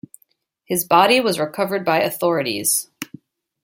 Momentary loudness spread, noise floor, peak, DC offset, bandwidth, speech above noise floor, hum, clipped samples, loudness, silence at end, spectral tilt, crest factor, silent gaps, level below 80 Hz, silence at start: 14 LU; -64 dBFS; 0 dBFS; under 0.1%; 17 kHz; 46 dB; none; under 0.1%; -18 LUFS; 0.6 s; -3 dB/octave; 20 dB; none; -66 dBFS; 0.7 s